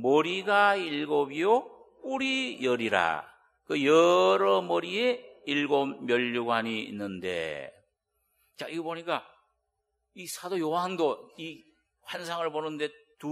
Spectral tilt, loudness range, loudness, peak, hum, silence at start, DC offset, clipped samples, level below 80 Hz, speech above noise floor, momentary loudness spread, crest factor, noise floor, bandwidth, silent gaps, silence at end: -4.5 dB/octave; 11 LU; -28 LUFS; -8 dBFS; none; 0 s; under 0.1%; under 0.1%; -76 dBFS; 53 dB; 15 LU; 22 dB; -80 dBFS; 14 kHz; none; 0 s